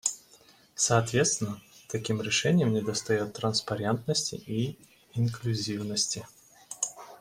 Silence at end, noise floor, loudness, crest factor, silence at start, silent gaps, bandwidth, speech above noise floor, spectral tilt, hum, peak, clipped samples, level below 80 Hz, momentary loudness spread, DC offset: 0.05 s; -58 dBFS; -29 LUFS; 22 dB; 0.05 s; none; 16 kHz; 30 dB; -4 dB/octave; none; -8 dBFS; under 0.1%; -62 dBFS; 12 LU; under 0.1%